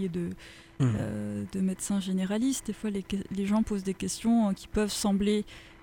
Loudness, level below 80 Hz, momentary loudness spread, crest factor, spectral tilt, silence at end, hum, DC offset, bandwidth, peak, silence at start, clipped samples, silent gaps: -30 LUFS; -50 dBFS; 8 LU; 14 dB; -5.5 dB/octave; 0 s; none; under 0.1%; 17 kHz; -16 dBFS; 0 s; under 0.1%; none